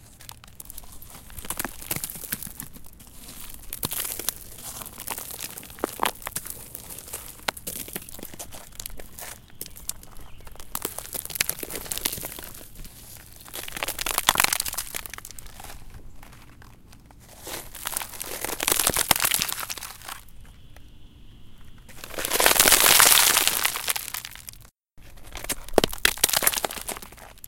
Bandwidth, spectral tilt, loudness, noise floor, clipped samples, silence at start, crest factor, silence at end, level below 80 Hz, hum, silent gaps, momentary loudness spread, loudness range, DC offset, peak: 17.5 kHz; -0.5 dB/octave; -23 LUFS; -49 dBFS; under 0.1%; 0 s; 28 dB; 0 s; -46 dBFS; none; none; 22 LU; 17 LU; under 0.1%; 0 dBFS